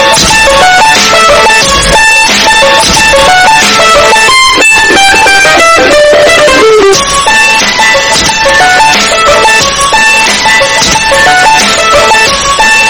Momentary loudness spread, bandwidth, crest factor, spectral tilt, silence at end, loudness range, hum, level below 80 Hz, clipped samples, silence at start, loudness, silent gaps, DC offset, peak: 2 LU; over 20 kHz; 4 dB; -1 dB/octave; 0 s; 2 LU; none; -26 dBFS; 10%; 0 s; -2 LUFS; none; under 0.1%; 0 dBFS